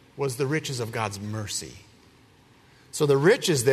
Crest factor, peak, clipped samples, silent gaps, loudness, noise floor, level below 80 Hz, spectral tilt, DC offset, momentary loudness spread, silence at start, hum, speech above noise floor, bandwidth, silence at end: 20 dB; -8 dBFS; under 0.1%; none; -25 LUFS; -56 dBFS; -62 dBFS; -4.5 dB/octave; under 0.1%; 13 LU; 0.15 s; none; 32 dB; 13.5 kHz; 0 s